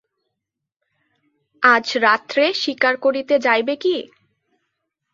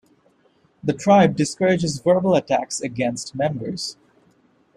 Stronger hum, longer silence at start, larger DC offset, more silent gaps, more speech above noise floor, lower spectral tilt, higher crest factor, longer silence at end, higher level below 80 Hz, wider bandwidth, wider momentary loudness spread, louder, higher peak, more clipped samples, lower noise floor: neither; first, 1.6 s vs 0.85 s; neither; neither; first, 64 dB vs 41 dB; second, -2.5 dB/octave vs -5.5 dB/octave; about the same, 20 dB vs 18 dB; first, 1.05 s vs 0.85 s; second, -72 dBFS vs -58 dBFS; second, 7.6 kHz vs 12 kHz; second, 6 LU vs 12 LU; about the same, -18 LUFS vs -20 LUFS; about the same, -2 dBFS vs -4 dBFS; neither; first, -82 dBFS vs -60 dBFS